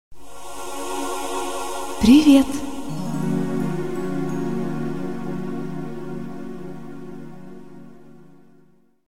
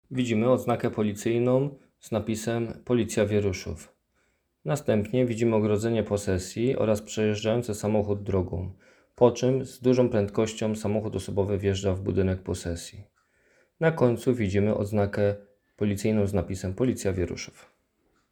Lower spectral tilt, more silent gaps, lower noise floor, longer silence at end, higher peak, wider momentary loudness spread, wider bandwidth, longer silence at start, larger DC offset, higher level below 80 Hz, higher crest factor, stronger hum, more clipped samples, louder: about the same, -5.5 dB/octave vs -6.5 dB/octave; neither; second, -57 dBFS vs -71 dBFS; second, 0 s vs 0.8 s; first, -2 dBFS vs -6 dBFS; first, 23 LU vs 9 LU; second, 16 kHz vs 19 kHz; about the same, 0.1 s vs 0.1 s; first, 3% vs under 0.1%; first, -46 dBFS vs -54 dBFS; about the same, 20 dB vs 20 dB; neither; neither; first, -22 LUFS vs -27 LUFS